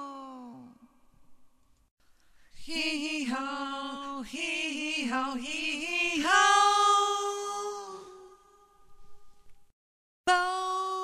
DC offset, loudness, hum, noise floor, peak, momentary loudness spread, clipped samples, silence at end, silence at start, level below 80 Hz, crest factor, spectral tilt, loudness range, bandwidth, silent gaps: under 0.1%; -28 LUFS; none; -59 dBFS; -10 dBFS; 19 LU; under 0.1%; 0 s; 0 s; -64 dBFS; 22 dB; -0.5 dB/octave; 11 LU; 15.5 kHz; 1.91-1.97 s, 9.73-10.24 s